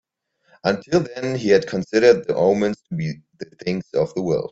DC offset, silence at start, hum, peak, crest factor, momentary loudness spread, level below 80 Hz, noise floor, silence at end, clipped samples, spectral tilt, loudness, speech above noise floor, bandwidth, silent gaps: under 0.1%; 0.65 s; none; -2 dBFS; 18 dB; 12 LU; -58 dBFS; -64 dBFS; 0 s; under 0.1%; -6 dB/octave; -20 LUFS; 44 dB; 8 kHz; none